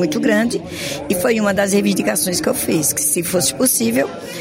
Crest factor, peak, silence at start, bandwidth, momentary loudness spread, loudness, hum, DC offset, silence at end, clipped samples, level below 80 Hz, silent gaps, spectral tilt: 14 dB; -4 dBFS; 0 s; 16.5 kHz; 6 LU; -17 LUFS; none; under 0.1%; 0 s; under 0.1%; -50 dBFS; none; -3.5 dB/octave